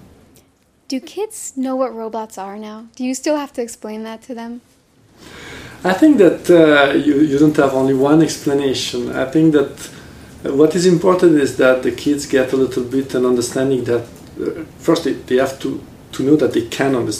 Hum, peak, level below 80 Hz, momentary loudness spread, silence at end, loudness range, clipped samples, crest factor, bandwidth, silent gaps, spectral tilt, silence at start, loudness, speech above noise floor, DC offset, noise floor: none; 0 dBFS; -50 dBFS; 17 LU; 0 s; 11 LU; under 0.1%; 16 dB; 15.5 kHz; none; -5.5 dB/octave; 0.9 s; -16 LUFS; 40 dB; under 0.1%; -55 dBFS